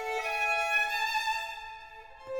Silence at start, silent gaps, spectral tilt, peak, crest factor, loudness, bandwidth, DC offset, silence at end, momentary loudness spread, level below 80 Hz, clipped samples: 0 s; none; 1 dB/octave; -18 dBFS; 14 dB; -29 LUFS; over 20 kHz; under 0.1%; 0 s; 20 LU; -62 dBFS; under 0.1%